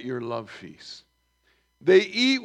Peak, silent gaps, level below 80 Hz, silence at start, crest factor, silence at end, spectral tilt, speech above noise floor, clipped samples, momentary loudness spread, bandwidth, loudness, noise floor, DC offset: -6 dBFS; none; -72 dBFS; 0 s; 20 dB; 0 s; -4.5 dB/octave; 44 dB; under 0.1%; 23 LU; 9.6 kHz; -23 LUFS; -68 dBFS; under 0.1%